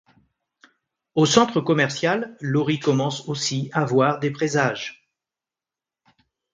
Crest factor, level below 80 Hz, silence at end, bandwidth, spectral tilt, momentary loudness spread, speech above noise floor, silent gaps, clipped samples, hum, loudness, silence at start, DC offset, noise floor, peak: 22 dB; -62 dBFS; 1.6 s; 9.4 kHz; -5 dB/octave; 8 LU; 69 dB; none; under 0.1%; none; -22 LUFS; 1.15 s; under 0.1%; -90 dBFS; 0 dBFS